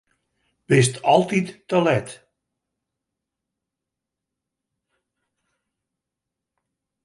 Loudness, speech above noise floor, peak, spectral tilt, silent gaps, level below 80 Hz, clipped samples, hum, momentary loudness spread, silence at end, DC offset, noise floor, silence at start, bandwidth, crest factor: -20 LUFS; 66 dB; -2 dBFS; -5.5 dB/octave; none; -64 dBFS; under 0.1%; none; 7 LU; 4.9 s; under 0.1%; -85 dBFS; 0.7 s; 11.5 kHz; 24 dB